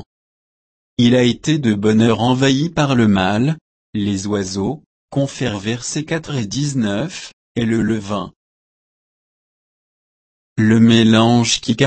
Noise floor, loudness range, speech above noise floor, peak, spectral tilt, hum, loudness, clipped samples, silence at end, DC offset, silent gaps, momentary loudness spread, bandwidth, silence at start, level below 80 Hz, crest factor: under -90 dBFS; 8 LU; over 74 dB; 0 dBFS; -5.5 dB/octave; none; -16 LUFS; under 0.1%; 0 s; under 0.1%; 3.61-3.93 s, 4.86-5.08 s, 7.33-7.55 s, 8.36-10.56 s; 13 LU; 8.8 kHz; 1 s; -48 dBFS; 18 dB